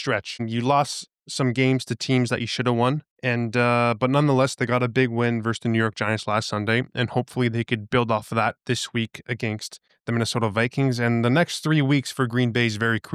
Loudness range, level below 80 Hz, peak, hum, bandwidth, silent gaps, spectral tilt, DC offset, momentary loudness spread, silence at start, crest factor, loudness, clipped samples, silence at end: 3 LU; -62 dBFS; -8 dBFS; none; 14 kHz; 3.10-3.16 s; -5.5 dB/octave; under 0.1%; 7 LU; 0 s; 16 dB; -23 LUFS; under 0.1%; 0 s